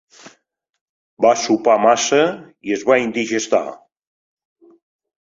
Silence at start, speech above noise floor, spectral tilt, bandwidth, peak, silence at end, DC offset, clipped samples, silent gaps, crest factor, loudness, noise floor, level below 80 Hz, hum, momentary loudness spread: 0.25 s; 44 dB; -3 dB/octave; 7.8 kHz; -2 dBFS; 1.55 s; under 0.1%; under 0.1%; 0.81-1.17 s; 18 dB; -17 LUFS; -61 dBFS; -64 dBFS; none; 9 LU